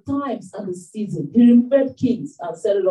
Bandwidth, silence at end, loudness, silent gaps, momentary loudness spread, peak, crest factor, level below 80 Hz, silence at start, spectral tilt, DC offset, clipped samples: 9.8 kHz; 0 s; -19 LUFS; none; 17 LU; -6 dBFS; 14 dB; -66 dBFS; 0.05 s; -7.5 dB/octave; under 0.1%; under 0.1%